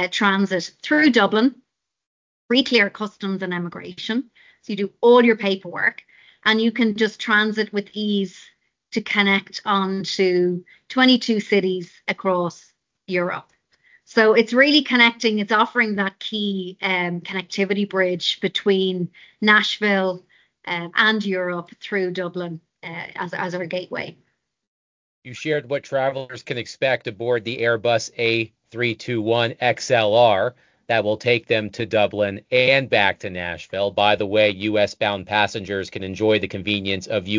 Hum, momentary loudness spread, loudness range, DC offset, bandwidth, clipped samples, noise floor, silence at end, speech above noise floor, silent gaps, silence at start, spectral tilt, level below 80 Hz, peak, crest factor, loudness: none; 13 LU; 7 LU; under 0.1%; 7.6 kHz; under 0.1%; -58 dBFS; 0 s; 38 dB; 2.07-2.49 s, 24.67-25.22 s; 0 s; -5 dB/octave; -58 dBFS; -2 dBFS; 20 dB; -20 LUFS